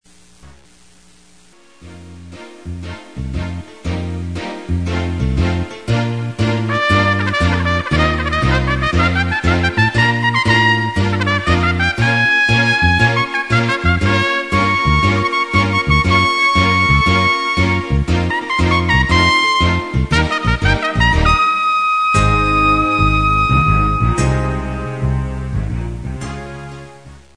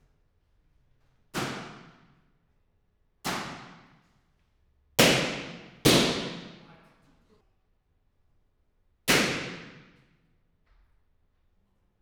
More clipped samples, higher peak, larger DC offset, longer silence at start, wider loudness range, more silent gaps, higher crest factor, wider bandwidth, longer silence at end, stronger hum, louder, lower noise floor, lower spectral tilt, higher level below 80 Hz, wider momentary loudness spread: neither; first, 0 dBFS vs -4 dBFS; first, 0.4% vs under 0.1%; second, 0.45 s vs 1.35 s; second, 9 LU vs 13 LU; neither; second, 16 dB vs 28 dB; second, 10.5 kHz vs over 20 kHz; second, 0.2 s vs 2.3 s; neither; first, -15 LUFS vs -26 LUFS; second, -48 dBFS vs -70 dBFS; first, -5.5 dB/octave vs -3 dB/octave; first, -26 dBFS vs -58 dBFS; second, 13 LU vs 23 LU